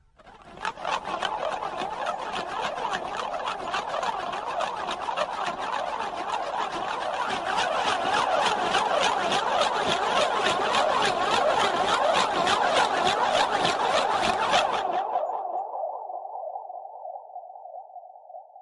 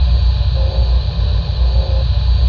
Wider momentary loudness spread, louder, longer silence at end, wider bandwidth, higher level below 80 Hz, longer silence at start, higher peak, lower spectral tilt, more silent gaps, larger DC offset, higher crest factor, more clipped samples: first, 14 LU vs 2 LU; second, -26 LUFS vs -16 LUFS; about the same, 0 s vs 0 s; first, 11.5 kHz vs 5.4 kHz; second, -60 dBFS vs -14 dBFS; first, 0.2 s vs 0 s; second, -8 dBFS vs -4 dBFS; second, -2 dB/octave vs -8 dB/octave; neither; neither; first, 18 dB vs 10 dB; neither